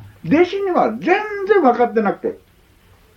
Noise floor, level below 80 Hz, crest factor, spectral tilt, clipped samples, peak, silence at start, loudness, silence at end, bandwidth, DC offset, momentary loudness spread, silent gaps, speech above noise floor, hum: -51 dBFS; -56 dBFS; 16 dB; -7 dB/octave; under 0.1%; -2 dBFS; 0 s; -17 LUFS; 0.8 s; 6.8 kHz; under 0.1%; 7 LU; none; 35 dB; none